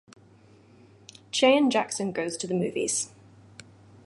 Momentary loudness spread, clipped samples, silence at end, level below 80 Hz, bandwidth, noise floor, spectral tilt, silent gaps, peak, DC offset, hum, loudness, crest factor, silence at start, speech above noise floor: 11 LU; under 0.1%; 1 s; -70 dBFS; 11.5 kHz; -55 dBFS; -3.5 dB/octave; none; -8 dBFS; under 0.1%; none; -26 LUFS; 20 dB; 1.35 s; 31 dB